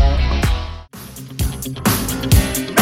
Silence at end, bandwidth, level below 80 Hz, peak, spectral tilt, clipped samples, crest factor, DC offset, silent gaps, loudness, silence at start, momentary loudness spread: 0 s; 17 kHz; -22 dBFS; 0 dBFS; -4.5 dB/octave; under 0.1%; 16 dB; under 0.1%; none; -18 LUFS; 0 s; 17 LU